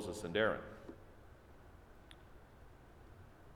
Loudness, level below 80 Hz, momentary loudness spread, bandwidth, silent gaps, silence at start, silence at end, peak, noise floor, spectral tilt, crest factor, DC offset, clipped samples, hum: -38 LUFS; -62 dBFS; 25 LU; 17.5 kHz; none; 0 s; 0 s; -20 dBFS; -59 dBFS; -4.5 dB/octave; 24 dB; under 0.1%; under 0.1%; none